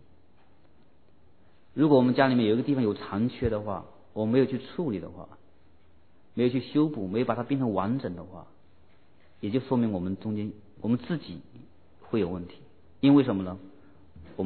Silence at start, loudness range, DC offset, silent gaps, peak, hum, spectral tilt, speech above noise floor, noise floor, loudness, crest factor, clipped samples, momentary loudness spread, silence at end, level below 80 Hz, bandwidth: 1.75 s; 6 LU; 0.2%; none; -6 dBFS; none; -11 dB/octave; 36 dB; -62 dBFS; -27 LUFS; 22 dB; under 0.1%; 19 LU; 0 s; -58 dBFS; 4.5 kHz